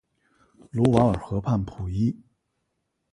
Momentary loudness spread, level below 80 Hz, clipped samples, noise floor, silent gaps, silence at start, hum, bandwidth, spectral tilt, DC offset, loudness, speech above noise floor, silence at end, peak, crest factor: 12 LU; -44 dBFS; under 0.1%; -77 dBFS; none; 0.75 s; none; 11 kHz; -8.5 dB/octave; under 0.1%; -25 LUFS; 54 dB; 1 s; -2 dBFS; 24 dB